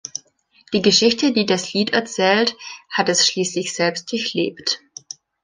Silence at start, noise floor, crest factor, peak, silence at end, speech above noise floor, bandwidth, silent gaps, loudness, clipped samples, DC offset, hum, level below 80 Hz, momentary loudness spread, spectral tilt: 0.15 s; -55 dBFS; 20 dB; 0 dBFS; 0.65 s; 36 dB; 10 kHz; none; -18 LUFS; under 0.1%; under 0.1%; none; -62 dBFS; 17 LU; -3 dB/octave